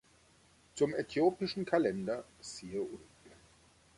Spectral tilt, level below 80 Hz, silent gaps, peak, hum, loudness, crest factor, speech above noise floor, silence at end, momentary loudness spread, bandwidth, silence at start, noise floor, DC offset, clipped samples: -5.5 dB/octave; -68 dBFS; none; -16 dBFS; none; -35 LUFS; 22 dB; 32 dB; 0.65 s; 15 LU; 11.5 kHz; 0.75 s; -66 dBFS; under 0.1%; under 0.1%